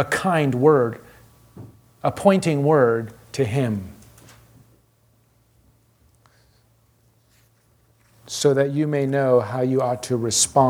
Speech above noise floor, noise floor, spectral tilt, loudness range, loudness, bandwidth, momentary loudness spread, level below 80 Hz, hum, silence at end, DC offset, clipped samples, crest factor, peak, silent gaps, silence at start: 41 dB; -61 dBFS; -5 dB/octave; 10 LU; -20 LUFS; 18.5 kHz; 10 LU; -58 dBFS; none; 0 s; under 0.1%; under 0.1%; 20 dB; -2 dBFS; none; 0 s